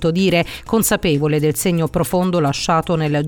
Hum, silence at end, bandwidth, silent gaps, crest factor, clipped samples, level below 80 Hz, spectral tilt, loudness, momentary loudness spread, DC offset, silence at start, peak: none; 0 s; 19.5 kHz; none; 12 dB; under 0.1%; -40 dBFS; -5 dB/octave; -17 LUFS; 3 LU; under 0.1%; 0 s; -4 dBFS